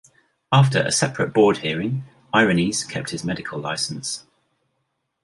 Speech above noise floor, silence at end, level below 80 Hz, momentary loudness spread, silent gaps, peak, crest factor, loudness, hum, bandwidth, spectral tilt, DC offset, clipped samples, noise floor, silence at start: 54 dB; 1.05 s; -56 dBFS; 11 LU; none; -2 dBFS; 20 dB; -21 LUFS; none; 11.5 kHz; -4.5 dB/octave; under 0.1%; under 0.1%; -74 dBFS; 0.5 s